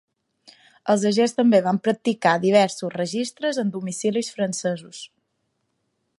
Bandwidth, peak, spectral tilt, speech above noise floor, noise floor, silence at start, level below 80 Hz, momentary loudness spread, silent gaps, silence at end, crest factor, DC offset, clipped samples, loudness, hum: 11.5 kHz; -4 dBFS; -5 dB/octave; 52 dB; -74 dBFS; 0.85 s; -72 dBFS; 12 LU; none; 1.15 s; 20 dB; under 0.1%; under 0.1%; -22 LUFS; none